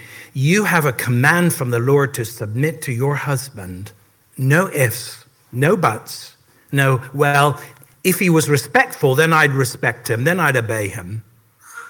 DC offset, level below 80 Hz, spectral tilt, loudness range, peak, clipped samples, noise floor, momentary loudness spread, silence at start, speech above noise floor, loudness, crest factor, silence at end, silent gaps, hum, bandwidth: under 0.1%; -58 dBFS; -5 dB/octave; 4 LU; 0 dBFS; under 0.1%; -45 dBFS; 16 LU; 0 s; 28 dB; -17 LUFS; 18 dB; 0 s; none; none; 18 kHz